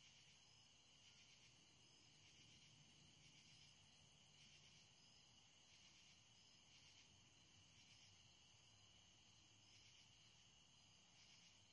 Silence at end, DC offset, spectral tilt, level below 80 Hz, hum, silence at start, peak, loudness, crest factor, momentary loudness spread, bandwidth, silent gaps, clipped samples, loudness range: 0 s; under 0.1%; -1.5 dB/octave; under -90 dBFS; none; 0 s; -56 dBFS; -69 LUFS; 16 dB; 2 LU; 10.5 kHz; none; under 0.1%; 1 LU